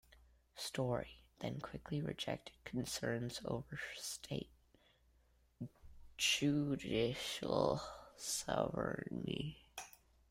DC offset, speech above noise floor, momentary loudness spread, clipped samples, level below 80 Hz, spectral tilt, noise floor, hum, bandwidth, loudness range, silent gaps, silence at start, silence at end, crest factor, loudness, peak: under 0.1%; 32 dB; 16 LU; under 0.1%; -64 dBFS; -4 dB/octave; -73 dBFS; none; 16 kHz; 7 LU; none; 0.1 s; 0.4 s; 22 dB; -41 LUFS; -20 dBFS